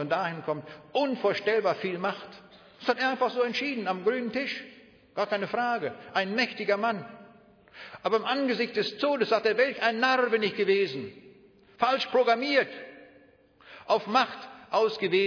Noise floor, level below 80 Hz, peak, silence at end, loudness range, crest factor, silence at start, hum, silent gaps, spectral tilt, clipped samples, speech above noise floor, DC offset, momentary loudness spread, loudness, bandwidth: -58 dBFS; -76 dBFS; -10 dBFS; 0 s; 4 LU; 18 dB; 0 s; none; none; -5 dB/octave; under 0.1%; 31 dB; under 0.1%; 12 LU; -27 LUFS; 5.4 kHz